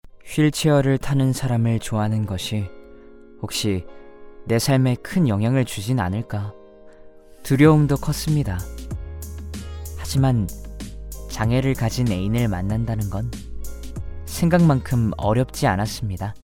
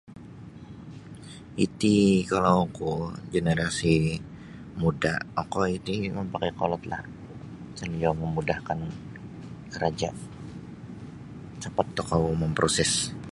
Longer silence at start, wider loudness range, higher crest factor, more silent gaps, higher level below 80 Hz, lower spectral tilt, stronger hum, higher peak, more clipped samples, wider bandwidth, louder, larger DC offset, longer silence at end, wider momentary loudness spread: about the same, 0.05 s vs 0.05 s; second, 4 LU vs 8 LU; about the same, 22 dB vs 22 dB; neither; first, -38 dBFS vs -48 dBFS; first, -6.5 dB/octave vs -5 dB/octave; neither; first, 0 dBFS vs -6 dBFS; neither; first, 18 kHz vs 11.5 kHz; first, -21 LUFS vs -27 LUFS; neither; about the same, 0.05 s vs 0 s; second, 17 LU vs 20 LU